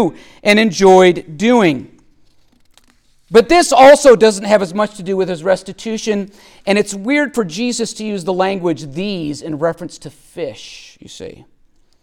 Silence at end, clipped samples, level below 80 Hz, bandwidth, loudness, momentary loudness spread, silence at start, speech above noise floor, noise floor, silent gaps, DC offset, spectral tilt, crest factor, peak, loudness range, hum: 0.7 s; under 0.1%; -46 dBFS; 17 kHz; -13 LUFS; 21 LU; 0 s; 39 dB; -52 dBFS; none; under 0.1%; -4.5 dB/octave; 14 dB; 0 dBFS; 10 LU; none